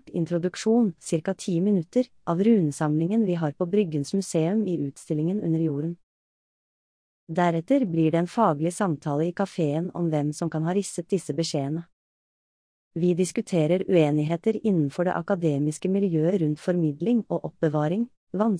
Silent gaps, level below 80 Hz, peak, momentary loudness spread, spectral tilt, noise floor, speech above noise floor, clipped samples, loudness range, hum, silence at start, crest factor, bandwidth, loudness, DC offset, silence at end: 6.03-7.27 s, 11.93-12.91 s, 18.17-18.27 s; -68 dBFS; -8 dBFS; 6 LU; -7 dB/octave; under -90 dBFS; over 66 dB; under 0.1%; 4 LU; none; 0.05 s; 16 dB; 10.5 kHz; -25 LUFS; under 0.1%; 0 s